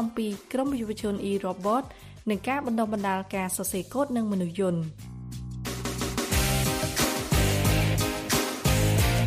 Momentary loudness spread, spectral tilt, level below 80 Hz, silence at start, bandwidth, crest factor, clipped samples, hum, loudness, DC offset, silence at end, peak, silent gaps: 10 LU; -4.5 dB/octave; -38 dBFS; 0 s; 15.5 kHz; 16 dB; under 0.1%; none; -27 LUFS; under 0.1%; 0 s; -10 dBFS; none